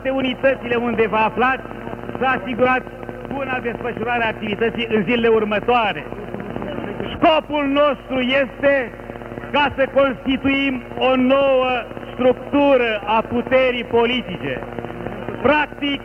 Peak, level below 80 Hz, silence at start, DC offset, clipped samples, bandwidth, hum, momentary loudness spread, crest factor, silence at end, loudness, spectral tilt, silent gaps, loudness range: -4 dBFS; -44 dBFS; 0 s; under 0.1%; under 0.1%; 6.4 kHz; none; 13 LU; 16 dB; 0 s; -19 LUFS; -7 dB/octave; none; 3 LU